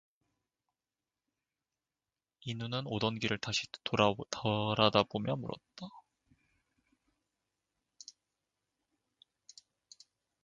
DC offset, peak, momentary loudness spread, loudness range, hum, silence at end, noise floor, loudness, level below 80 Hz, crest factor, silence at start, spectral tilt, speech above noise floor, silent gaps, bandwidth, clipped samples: under 0.1%; -10 dBFS; 22 LU; 11 LU; none; 4.45 s; under -90 dBFS; -33 LUFS; -68 dBFS; 28 dB; 2.45 s; -5 dB/octave; over 56 dB; none; 9.2 kHz; under 0.1%